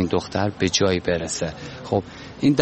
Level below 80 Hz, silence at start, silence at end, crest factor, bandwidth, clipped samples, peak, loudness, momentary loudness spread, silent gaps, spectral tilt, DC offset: -46 dBFS; 0 s; 0 s; 22 dB; 8.8 kHz; under 0.1%; -2 dBFS; -23 LUFS; 10 LU; none; -4.5 dB/octave; under 0.1%